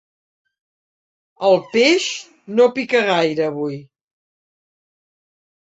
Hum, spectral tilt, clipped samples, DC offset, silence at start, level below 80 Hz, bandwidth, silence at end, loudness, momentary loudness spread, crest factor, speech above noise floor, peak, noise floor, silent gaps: none; -4 dB/octave; under 0.1%; under 0.1%; 1.4 s; -68 dBFS; 8 kHz; 1.95 s; -17 LUFS; 12 LU; 18 dB; over 73 dB; -2 dBFS; under -90 dBFS; none